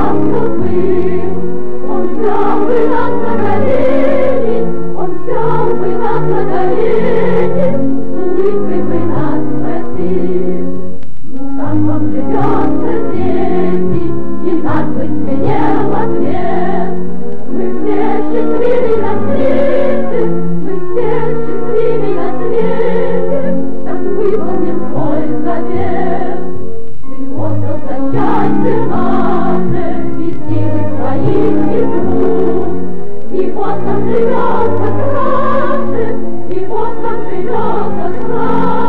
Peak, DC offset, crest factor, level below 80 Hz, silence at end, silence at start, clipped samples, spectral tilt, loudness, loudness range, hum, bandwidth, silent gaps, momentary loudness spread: 0 dBFS; 50%; 8 dB; -40 dBFS; 0 s; 0 s; under 0.1%; -10 dB/octave; -15 LUFS; 3 LU; none; 6 kHz; none; 7 LU